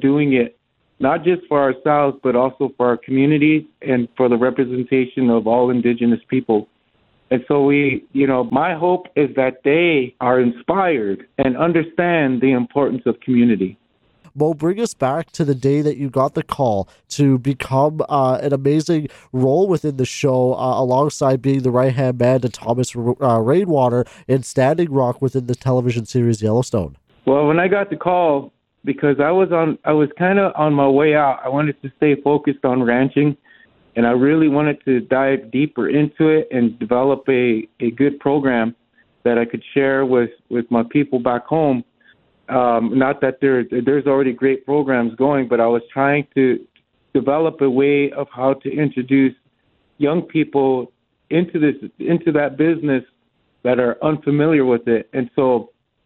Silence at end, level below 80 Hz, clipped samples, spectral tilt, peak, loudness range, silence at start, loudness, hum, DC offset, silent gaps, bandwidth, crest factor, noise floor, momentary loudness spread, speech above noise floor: 0.4 s; -56 dBFS; under 0.1%; -7.5 dB/octave; 0 dBFS; 2 LU; 0 s; -18 LUFS; none; under 0.1%; none; 11.5 kHz; 16 dB; -64 dBFS; 6 LU; 47 dB